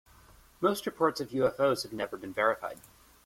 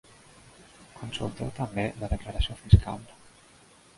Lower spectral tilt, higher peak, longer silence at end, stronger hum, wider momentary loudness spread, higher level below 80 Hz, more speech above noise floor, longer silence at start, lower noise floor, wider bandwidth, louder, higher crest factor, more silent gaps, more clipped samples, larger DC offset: second, -4.5 dB/octave vs -6.5 dB/octave; second, -12 dBFS vs -4 dBFS; second, 0.5 s vs 0.95 s; neither; second, 9 LU vs 18 LU; second, -64 dBFS vs -34 dBFS; about the same, 28 dB vs 30 dB; second, 0.6 s vs 0.95 s; about the same, -58 dBFS vs -56 dBFS; first, 16.5 kHz vs 11.5 kHz; about the same, -30 LUFS vs -28 LUFS; second, 20 dB vs 26 dB; neither; neither; neither